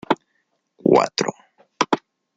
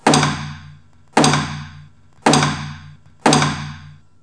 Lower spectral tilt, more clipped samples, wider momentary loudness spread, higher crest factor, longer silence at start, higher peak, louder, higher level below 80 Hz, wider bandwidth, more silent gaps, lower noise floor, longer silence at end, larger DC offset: about the same, -4.5 dB/octave vs -4 dB/octave; neither; second, 9 LU vs 22 LU; about the same, 20 dB vs 18 dB; about the same, 0.1 s vs 0.05 s; about the same, -2 dBFS vs 0 dBFS; second, -21 LUFS vs -17 LUFS; second, -64 dBFS vs -52 dBFS; second, 9 kHz vs 11 kHz; neither; first, -70 dBFS vs -45 dBFS; about the same, 0.4 s vs 0.3 s; second, under 0.1% vs 0.4%